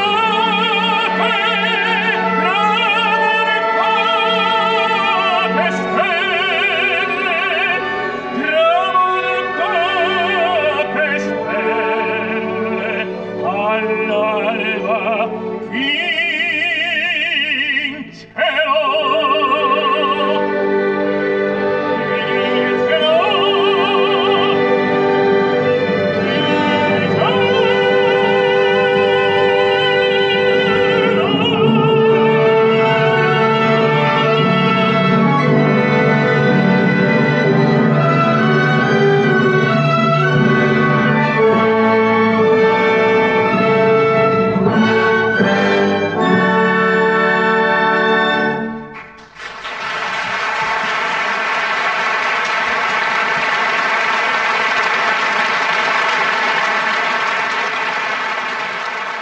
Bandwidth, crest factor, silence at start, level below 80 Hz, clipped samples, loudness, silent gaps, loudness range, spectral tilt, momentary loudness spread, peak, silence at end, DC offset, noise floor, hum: 8.6 kHz; 14 dB; 0 s; -54 dBFS; under 0.1%; -14 LUFS; none; 4 LU; -6 dB/octave; 5 LU; -2 dBFS; 0 s; under 0.1%; -35 dBFS; none